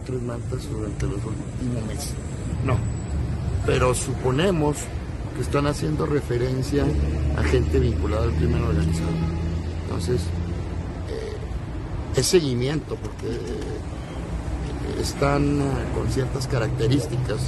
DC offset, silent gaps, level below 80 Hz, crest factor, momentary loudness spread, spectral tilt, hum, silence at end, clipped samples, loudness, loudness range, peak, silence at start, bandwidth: under 0.1%; none; -30 dBFS; 18 dB; 10 LU; -6 dB/octave; none; 0 s; under 0.1%; -25 LUFS; 4 LU; -6 dBFS; 0 s; 12.5 kHz